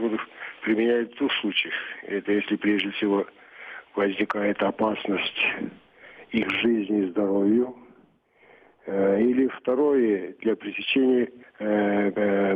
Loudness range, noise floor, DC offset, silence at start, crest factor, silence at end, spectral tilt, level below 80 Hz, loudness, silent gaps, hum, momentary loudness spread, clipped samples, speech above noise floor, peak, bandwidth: 3 LU; -59 dBFS; under 0.1%; 0 s; 14 dB; 0 s; -7.5 dB/octave; -66 dBFS; -25 LUFS; none; none; 10 LU; under 0.1%; 35 dB; -10 dBFS; 5 kHz